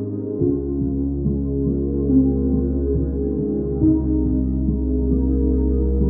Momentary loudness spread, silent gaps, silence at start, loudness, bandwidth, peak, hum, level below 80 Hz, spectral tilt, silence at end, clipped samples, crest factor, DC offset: 5 LU; none; 0 s; -21 LUFS; 1.6 kHz; -6 dBFS; none; -24 dBFS; -17.5 dB/octave; 0 s; under 0.1%; 14 dB; under 0.1%